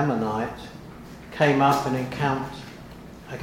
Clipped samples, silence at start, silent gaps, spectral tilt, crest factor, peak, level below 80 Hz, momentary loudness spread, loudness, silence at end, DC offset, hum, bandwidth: under 0.1%; 0 s; none; -6.5 dB/octave; 20 dB; -4 dBFS; -50 dBFS; 22 LU; -24 LUFS; 0 s; under 0.1%; none; 16.5 kHz